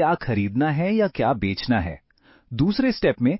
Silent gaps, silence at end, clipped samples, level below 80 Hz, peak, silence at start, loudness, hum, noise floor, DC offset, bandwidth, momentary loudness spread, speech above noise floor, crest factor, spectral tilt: none; 0 s; under 0.1%; -44 dBFS; -6 dBFS; 0 s; -22 LUFS; none; -52 dBFS; under 0.1%; 5.8 kHz; 6 LU; 31 dB; 16 dB; -11 dB/octave